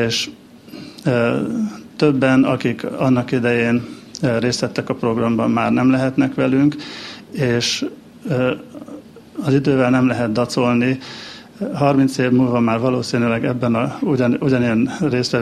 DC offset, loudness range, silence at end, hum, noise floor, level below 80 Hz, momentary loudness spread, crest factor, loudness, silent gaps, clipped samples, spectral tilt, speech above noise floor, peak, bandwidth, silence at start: under 0.1%; 2 LU; 0 s; none; -37 dBFS; -54 dBFS; 14 LU; 16 dB; -18 LUFS; none; under 0.1%; -6 dB/octave; 20 dB; -2 dBFS; 13 kHz; 0 s